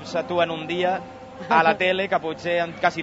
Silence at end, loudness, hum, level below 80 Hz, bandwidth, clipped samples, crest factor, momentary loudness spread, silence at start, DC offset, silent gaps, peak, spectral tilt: 0 s; -22 LUFS; none; -60 dBFS; 8 kHz; under 0.1%; 20 dB; 9 LU; 0 s; under 0.1%; none; -2 dBFS; -5 dB/octave